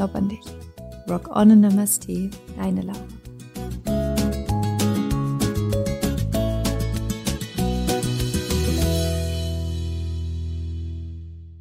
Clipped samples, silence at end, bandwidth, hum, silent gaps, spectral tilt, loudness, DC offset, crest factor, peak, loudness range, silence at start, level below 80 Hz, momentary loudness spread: under 0.1%; 0 s; 16 kHz; none; none; -6 dB/octave; -23 LUFS; under 0.1%; 18 dB; -4 dBFS; 4 LU; 0 s; -34 dBFS; 16 LU